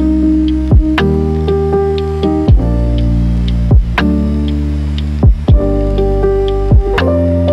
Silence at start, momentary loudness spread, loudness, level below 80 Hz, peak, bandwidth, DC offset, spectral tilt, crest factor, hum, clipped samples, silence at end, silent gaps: 0 s; 4 LU; -13 LUFS; -14 dBFS; 0 dBFS; 6.2 kHz; under 0.1%; -9 dB/octave; 10 dB; none; under 0.1%; 0 s; none